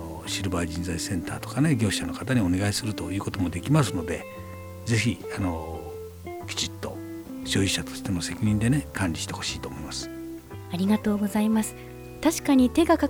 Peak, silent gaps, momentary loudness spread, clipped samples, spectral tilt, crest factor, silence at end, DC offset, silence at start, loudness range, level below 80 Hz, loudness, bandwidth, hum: -8 dBFS; none; 14 LU; under 0.1%; -5 dB/octave; 18 dB; 0 s; under 0.1%; 0 s; 4 LU; -48 dBFS; -26 LUFS; over 20 kHz; none